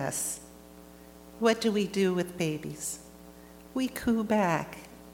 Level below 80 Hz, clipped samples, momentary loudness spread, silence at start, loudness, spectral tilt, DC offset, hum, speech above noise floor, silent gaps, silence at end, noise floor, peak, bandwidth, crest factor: -58 dBFS; under 0.1%; 24 LU; 0 s; -30 LUFS; -4.5 dB/octave; under 0.1%; none; 22 dB; none; 0 s; -51 dBFS; -10 dBFS; 19 kHz; 20 dB